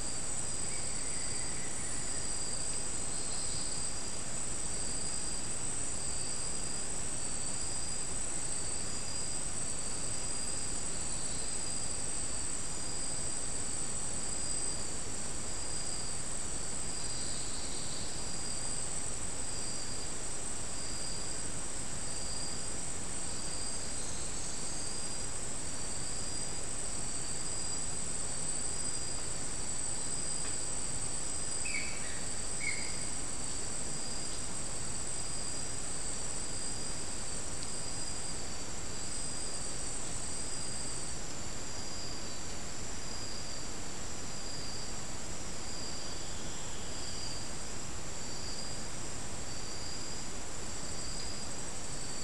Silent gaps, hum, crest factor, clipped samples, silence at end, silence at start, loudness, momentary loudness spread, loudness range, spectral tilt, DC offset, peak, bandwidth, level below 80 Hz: none; none; 16 dB; under 0.1%; 0 s; 0 s; -37 LUFS; 6 LU; 5 LU; -1.5 dB/octave; 2%; -20 dBFS; 12 kHz; -50 dBFS